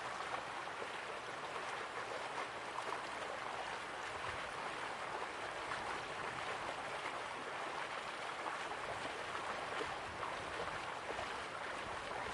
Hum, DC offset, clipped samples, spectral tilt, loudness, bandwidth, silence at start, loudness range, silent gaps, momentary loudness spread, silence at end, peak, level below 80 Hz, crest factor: none; under 0.1%; under 0.1%; -2.5 dB/octave; -43 LUFS; 11.5 kHz; 0 s; 1 LU; none; 2 LU; 0 s; -26 dBFS; -70 dBFS; 18 dB